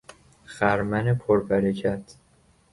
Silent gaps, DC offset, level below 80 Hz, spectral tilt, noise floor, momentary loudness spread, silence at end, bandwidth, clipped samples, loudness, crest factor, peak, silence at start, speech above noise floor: none; under 0.1%; -52 dBFS; -7.5 dB/octave; -60 dBFS; 9 LU; 0.6 s; 11.5 kHz; under 0.1%; -24 LUFS; 18 dB; -8 dBFS; 0.5 s; 37 dB